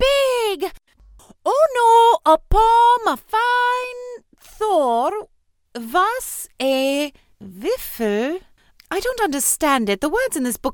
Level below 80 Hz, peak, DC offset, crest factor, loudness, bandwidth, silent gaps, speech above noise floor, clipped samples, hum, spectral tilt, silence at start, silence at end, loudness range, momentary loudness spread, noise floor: -36 dBFS; -4 dBFS; under 0.1%; 16 dB; -18 LUFS; 19 kHz; none; 40 dB; under 0.1%; none; -3 dB/octave; 0 s; 0 s; 7 LU; 15 LU; -60 dBFS